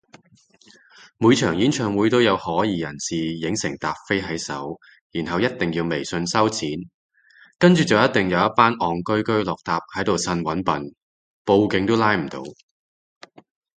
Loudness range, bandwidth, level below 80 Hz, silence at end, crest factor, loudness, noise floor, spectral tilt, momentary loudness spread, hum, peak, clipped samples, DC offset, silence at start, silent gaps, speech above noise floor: 5 LU; 9.4 kHz; -52 dBFS; 1.25 s; 22 dB; -21 LUFS; -56 dBFS; -5 dB/octave; 12 LU; none; 0 dBFS; under 0.1%; under 0.1%; 1.2 s; 5.01-5.10 s, 6.94-7.09 s, 11.02-11.45 s; 36 dB